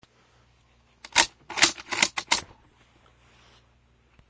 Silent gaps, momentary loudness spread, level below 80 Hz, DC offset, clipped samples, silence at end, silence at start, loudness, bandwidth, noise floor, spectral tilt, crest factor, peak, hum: none; 5 LU; -60 dBFS; under 0.1%; under 0.1%; 1.85 s; 1.15 s; -23 LUFS; 8 kHz; -62 dBFS; 0.5 dB/octave; 28 dB; -2 dBFS; none